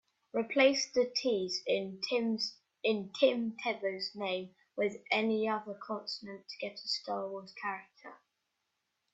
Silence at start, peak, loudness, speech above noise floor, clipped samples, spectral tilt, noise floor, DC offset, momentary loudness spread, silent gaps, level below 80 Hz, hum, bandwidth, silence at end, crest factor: 0.35 s; -14 dBFS; -34 LUFS; 50 dB; under 0.1%; -3.5 dB/octave; -83 dBFS; under 0.1%; 12 LU; none; -80 dBFS; none; 8 kHz; 1 s; 20 dB